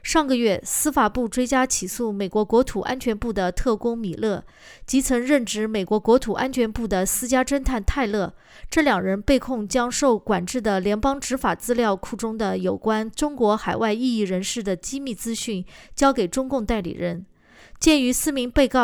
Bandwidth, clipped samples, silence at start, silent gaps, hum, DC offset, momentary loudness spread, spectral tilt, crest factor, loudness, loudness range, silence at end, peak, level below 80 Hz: over 20 kHz; under 0.1%; 0.05 s; none; none; under 0.1%; 7 LU; -4 dB/octave; 16 dB; -22 LUFS; 2 LU; 0 s; -6 dBFS; -38 dBFS